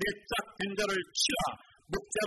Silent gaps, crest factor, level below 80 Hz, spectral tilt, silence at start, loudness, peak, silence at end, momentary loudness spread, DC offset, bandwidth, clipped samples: none; 18 dB; -54 dBFS; -2 dB/octave; 0 s; -32 LUFS; -16 dBFS; 0 s; 10 LU; under 0.1%; 12 kHz; under 0.1%